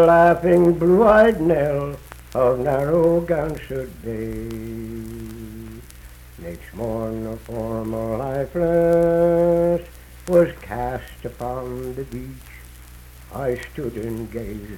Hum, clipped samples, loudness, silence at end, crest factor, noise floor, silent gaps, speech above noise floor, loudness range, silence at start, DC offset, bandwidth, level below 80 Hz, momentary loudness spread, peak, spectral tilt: none; under 0.1%; -20 LUFS; 0 s; 18 dB; -42 dBFS; none; 22 dB; 13 LU; 0 s; under 0.1%; 17.5 kHz; -40 dBFS; 20 LU; -4 dBFS; -8 dB/octave